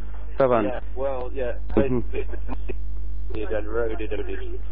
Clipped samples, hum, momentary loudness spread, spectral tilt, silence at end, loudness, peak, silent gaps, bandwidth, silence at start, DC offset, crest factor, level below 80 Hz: under 0.1%; 50 Hz at -35 dBFS; 12 LU; -11 dB/octave; 0 s; -27 LUFS; -4 dBFS; none; 4.4 kHz; 0 s; 8%; 20 dB; -32 dBFS